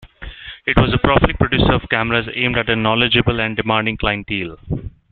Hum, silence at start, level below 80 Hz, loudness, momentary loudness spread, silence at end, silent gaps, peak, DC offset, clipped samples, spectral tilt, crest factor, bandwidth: none; 0 s; -30 dBFS; -17 LUFS; 13 LU; 0.25 s; none; 0 dBFS; under 0.1%; under 0.1%; -9 dB/octave; 16 dB; 4.6 kHz